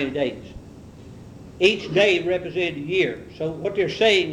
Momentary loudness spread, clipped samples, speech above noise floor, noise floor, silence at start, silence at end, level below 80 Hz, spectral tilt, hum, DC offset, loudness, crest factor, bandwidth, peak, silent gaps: 24 LU; under 0.1%; 20 dB; -42 dBFS; 0 s; 0 s; -52 dBFS; -4.5 dB/octave; none; under 0.1%; -22 LUFS; 20 dB; 10.5 kHz; -4 dBFS; none